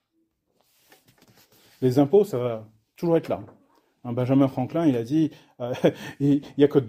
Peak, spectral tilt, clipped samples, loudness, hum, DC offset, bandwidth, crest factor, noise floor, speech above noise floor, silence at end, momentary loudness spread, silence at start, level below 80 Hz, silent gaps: -6 dBFS; -8 dB/octave; under 0.1%; -24 LUFS; none; under 0.1%; 15.5 kHz; 18 dB; -73 dBFS; 50 dB; 0 s; 12 LU; 1.8 s; -64 dBFS; none